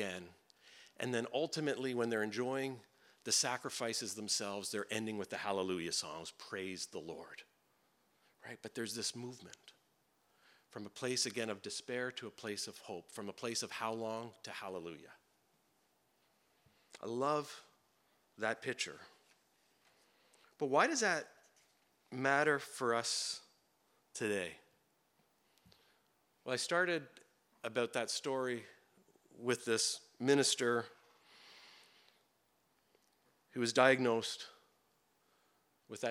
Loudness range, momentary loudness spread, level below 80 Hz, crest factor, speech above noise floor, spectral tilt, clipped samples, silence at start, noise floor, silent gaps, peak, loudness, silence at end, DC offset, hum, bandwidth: 9 LU; 19 LU; under -90 dBFS; 28 dB; 39 dB; -2.5 dB/octave; under 0.1%; 0 s; -77 dBFS; none; -12 dBFS; -37 LUFS; 0 s; under 0.1%; none; 16.5 kHz